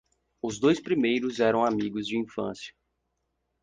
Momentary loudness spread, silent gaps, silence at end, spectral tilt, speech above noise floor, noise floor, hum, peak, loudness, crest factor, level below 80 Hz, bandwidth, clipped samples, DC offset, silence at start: 12 LU; none; 0.9 s; -5.5 dB/octave; 52 dB; -78 dBFS; 60 Hz at -60 dBFS; -10 dBFS; -27 LUFS; 18 dB; -64 dBFS; 9.8 kHz; under 0.1%; under 0.1%; 0.45 s